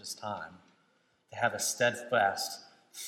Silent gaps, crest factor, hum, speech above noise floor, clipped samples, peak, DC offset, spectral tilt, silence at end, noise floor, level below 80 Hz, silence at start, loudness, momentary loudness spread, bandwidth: none; 20 dB; none; 39 dB; under 0.1%; -14 dBFS; under 0.1%; -2 dB/octave; 0 s; -71 dBFS; -82 dBFS; 0.05 s; -31 LUFS; 19 LU; 16.5 kHz